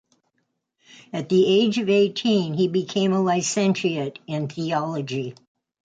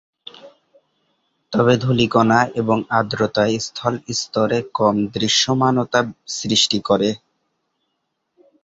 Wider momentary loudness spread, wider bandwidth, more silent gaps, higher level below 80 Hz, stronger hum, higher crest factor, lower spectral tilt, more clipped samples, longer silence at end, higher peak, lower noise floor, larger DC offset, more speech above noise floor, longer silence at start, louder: first, 11 LU vs 8 LU; first, 9.4 kHz vs 8 kHz; neither; second, -68 dBFS vs -54 dBFS; neither; second, 14 dB vs 20 dB; about the same, -5 dB/octave vs -4.5 dB/octave; neither; second, 0.55 s vs 1.45 s; second, -8 dBFS vs 0 dBFS; about the same, -74 dBFS vs -74 dBFS; neither; about the same, 53 dB vs 56 dB; first, 1.15 s vs 0.45 s; second, -22 LUFS vs -18 LUFS